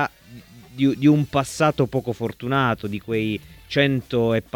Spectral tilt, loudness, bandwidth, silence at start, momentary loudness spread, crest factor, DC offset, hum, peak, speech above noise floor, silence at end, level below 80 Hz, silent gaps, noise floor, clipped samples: -6.5 dB/octave; -22 LUFS; 17 kHz; 0 s; 10 LU; 16 dB; under 0.1%; none; -6 dBFS; 24 dB; 0.15 s; -50 dBFS; none; -45 dBFS; under 0.1%